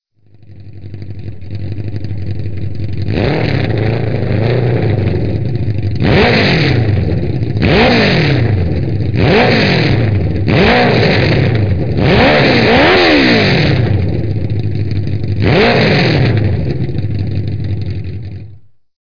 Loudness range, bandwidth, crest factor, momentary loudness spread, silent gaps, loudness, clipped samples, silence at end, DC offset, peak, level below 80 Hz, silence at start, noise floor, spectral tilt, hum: 7 LU; 5.4 kHz; 12 dB; 14 LU; none; -12 LUFS; under 0.1%; 0.05 s; 5%; 0 dBFS; -28 dBFS; 0 s; -43 dBFS; -7.5 dB/octave; none